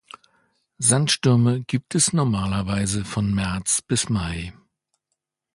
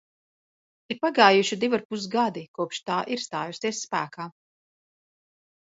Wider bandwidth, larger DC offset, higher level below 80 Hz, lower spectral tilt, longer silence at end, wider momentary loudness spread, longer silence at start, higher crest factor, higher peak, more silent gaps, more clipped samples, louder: first, 11.5 kHz vs 8 kHz; neither; first, -44 dBFS vs -76 dBFS; about the same, -4 dB/octave vs -3.5 dB/octave; second, 1 s vs 1.5 s; second, 7 LU vs 15 LU; about the same, 0.8 s vs 0.9 s; second, 18 dB vs 26 dB; second, -6 dBFS vs -2 dBFS; second, none vs 1.85-1.90 s, 2.48-2.54 s; neither; first, -21 LUFS vs -25 LUFS